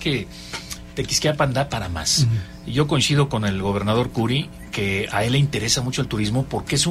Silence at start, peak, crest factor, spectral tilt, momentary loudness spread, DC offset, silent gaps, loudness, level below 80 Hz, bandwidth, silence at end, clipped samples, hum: 0 s; -6 dBFS; 16 dB; -4.5 dB/octave; 10 LU; under 0.1%; none; -21 LUFS; -40 dBFS; 15.5 kHz; 0 s; under 0.1%; none